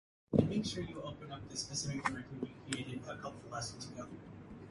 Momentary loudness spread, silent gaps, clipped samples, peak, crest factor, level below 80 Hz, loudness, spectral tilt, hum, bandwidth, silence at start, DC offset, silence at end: 15 LU; none; under 0.1%; -14 dBFS; 26 dB; -62 dBFS; -40 LUFS; -4.5 dB/octave; none; 11.5 kHz; 0.3 s; under 0.1%; 0 s